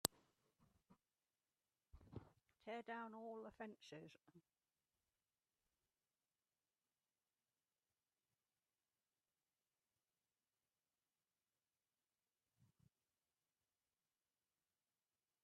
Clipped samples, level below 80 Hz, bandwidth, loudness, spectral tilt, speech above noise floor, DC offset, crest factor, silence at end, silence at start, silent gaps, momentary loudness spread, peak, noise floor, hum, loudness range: under 0.1%; -84 dBFS; 7.2 kHz; -55 LUFS; -3 dB/octave; over 34 dB; under 0.1%; 46 dB; 2.8 s; 0.05 s; none; 10 LU; -16 dBFS; under -90 dBFS; none; 7 LU